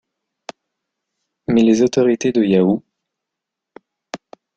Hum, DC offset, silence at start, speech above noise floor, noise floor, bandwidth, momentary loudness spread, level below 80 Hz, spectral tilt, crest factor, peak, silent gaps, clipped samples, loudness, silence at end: none; under 0.1%; 1.5 s; 68 dB; -82 dBFS; 8.2 kHz; 24 LU; -58 dBFS; -6.5 dB/octave; 16 dB; -2 dBFS; none; under 0.1%; -16 LUFS; 0.4 s